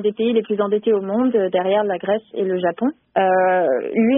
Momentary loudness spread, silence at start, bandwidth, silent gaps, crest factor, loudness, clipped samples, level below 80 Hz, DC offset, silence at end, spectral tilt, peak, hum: 5 LU; 0 s; 3.8 kHz; none; 14 dB; -19 LUFS; under 0.1%; -66 dBFS; under 0.1%; 0 s; -2.5 dB/octave; -4 dBFS; none